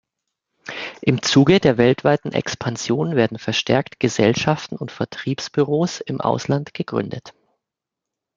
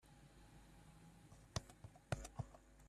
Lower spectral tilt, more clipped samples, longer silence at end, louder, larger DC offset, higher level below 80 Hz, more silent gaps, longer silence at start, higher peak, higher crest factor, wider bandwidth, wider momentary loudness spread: about the same, -5.5 dB/octave vs -4.5 dB/octave; neither; first, 1.05 s vs 0 s; first, -20 LUFS vs -52 LUFS; neither; first, -54 dBFS vs -64 dBFS; neither; first, 0.65 s vs 0 s; first, -2 dBFS vs -22 dBFS; second, 18 dB vs 32 dB; second, 7.6 kHz vs 13.5 kHz; second, 13 LU vs 16 LU